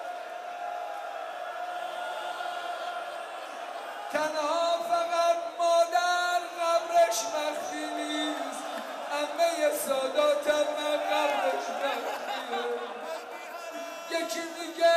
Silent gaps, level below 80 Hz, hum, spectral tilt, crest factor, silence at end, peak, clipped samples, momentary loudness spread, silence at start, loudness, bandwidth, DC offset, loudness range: none; -82 dBFS; none; -0.5 dB/octave; 16 dB; 0 s; -14 dBFS; under 0.1%; 13 LU; 0 s; -30 LUFS; 15.5 kHz; under 0.1%; 9 LU